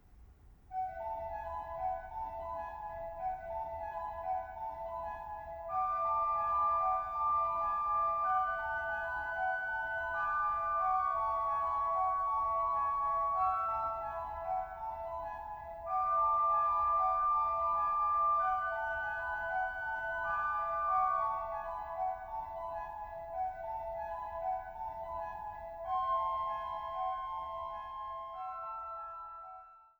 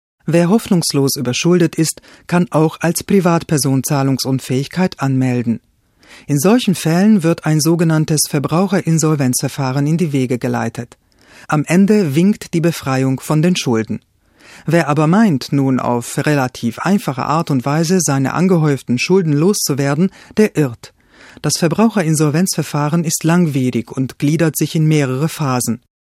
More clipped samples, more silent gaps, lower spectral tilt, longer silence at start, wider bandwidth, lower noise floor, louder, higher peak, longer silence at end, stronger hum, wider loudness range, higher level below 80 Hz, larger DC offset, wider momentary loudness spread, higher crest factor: neither; neither; about the same, -5.5 dB/octave vs -5.5 dB/octave; second, 0.1 s vs 0.25 s; first, over 20 kHz vs 16 kHz; first, -58 dBFS vs -44 dBFS; second, -35 LUFS vs -15 LUFS; second, -22 dBFS vs 0 dBFS; second, 0.15 s vs 0.3 s; neither; first, 9 LU vs 2 LU; about the same, -58 dBFS vs -54 dBFS; neither; first, 12 LU vs 6 LU; about the same, 14 dB vs 14 dB